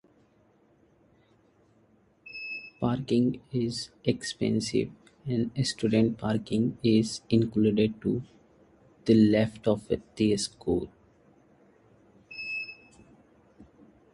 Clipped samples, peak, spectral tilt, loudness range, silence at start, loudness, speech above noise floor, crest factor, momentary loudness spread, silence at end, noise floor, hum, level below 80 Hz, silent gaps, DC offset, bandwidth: under 0.1%; -10 dBFS; -6 dB/octave; 9 LU; 2.25 s; -28 LUFS; 37 dB; 20 dB; 13 LU; 0.5 s; -64 dBFS; none; -56 dBFS; none; under 0.1%; 11.5 kHz